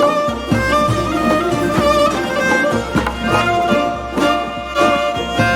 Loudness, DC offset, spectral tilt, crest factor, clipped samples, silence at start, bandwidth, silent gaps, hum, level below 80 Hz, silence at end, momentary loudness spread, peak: -16 LUFS; under 0.1%; -5 dB/octave; 14 dB; under 0.1%; 0 s; 17 kHz; none; none; -34 dBFS; 0 s; 4 LU; -2 dBFS